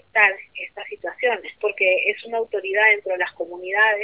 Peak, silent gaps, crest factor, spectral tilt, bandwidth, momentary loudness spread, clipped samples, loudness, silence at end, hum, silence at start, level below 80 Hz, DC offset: -2 dBFS; none; 20 dB; -4.5 dB/octave; 4 kHz; 15 LU; under 0.1%; -20 LUFS; 0 s; none; 0.15 s; -72 dBFS; under 0.1%